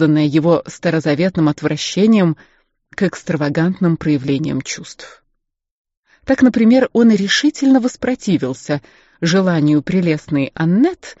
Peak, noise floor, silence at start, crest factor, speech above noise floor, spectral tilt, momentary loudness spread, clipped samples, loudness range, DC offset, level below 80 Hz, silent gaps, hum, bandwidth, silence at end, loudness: -2 dBFS; -69 dBFS; 0 s; 14 dB; 54 dB; -6 dB/octave; 11 LU; under 0.1%; 5 LU; under 0.1%; -52 dBFS; 5.71-5.85 s, 5.97-6.03 s; none; 8 kHz; 0.05 s; -16 LUFS